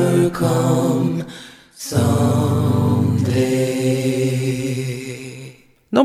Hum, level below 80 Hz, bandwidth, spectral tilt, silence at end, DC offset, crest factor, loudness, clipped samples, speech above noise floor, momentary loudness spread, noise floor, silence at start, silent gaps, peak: none; -52 dBFS; 15 kHz; -6.5 dB/octave; 0 s; under 0.1%; 16 dB; -18 LUFS; under 0.1%; 24 dB; 15 LU; -41 dBFS; 0 s; none; -2 dBFS